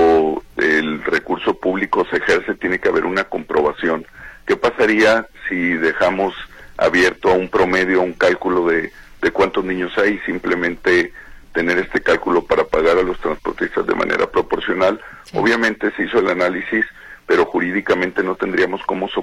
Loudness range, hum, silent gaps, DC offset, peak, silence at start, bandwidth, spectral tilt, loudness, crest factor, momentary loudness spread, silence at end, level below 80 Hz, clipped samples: 2 LU; none; none; under 0.1%; -4 dBFS; 0 s; 13 kHz; -5 dB/octave; -18 LUFS; 14 dB; 7 LU; 0 s; -44 dBFS; under 0.1%